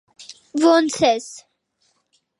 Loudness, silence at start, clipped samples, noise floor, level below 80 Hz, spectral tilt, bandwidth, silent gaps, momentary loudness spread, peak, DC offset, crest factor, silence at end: -18 LUFS; 0.2 s; under 0.1%; -67 dBFS; -62 dBFS; -3.5 dB/octave; 11.5 kHz; none; 24 LU; -4 dBFS; under 0.1%; 18 dB; 1 s